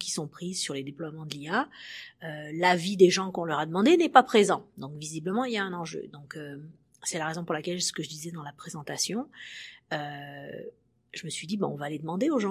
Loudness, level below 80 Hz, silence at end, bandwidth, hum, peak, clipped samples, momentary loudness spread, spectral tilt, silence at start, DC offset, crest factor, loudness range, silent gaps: -28 LUFS; -74 dBFS; 0 s; 15.5 kHz; none; -2 dBFS; under 0.1%; 20 LU; -4 dB/octave; 0 s; under 0.1%; 26 dB; 11 LU; none